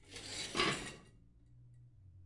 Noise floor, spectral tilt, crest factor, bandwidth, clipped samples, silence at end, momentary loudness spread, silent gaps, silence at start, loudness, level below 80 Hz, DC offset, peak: -63 dBFS; -2.5 dB/octave; 26 dB; 11.5 kHz; under 0.1%; 0 s; 15 LU; none; 0 s; -38 LUFS; -64 dBFS; under 0.1%; -18 dBFS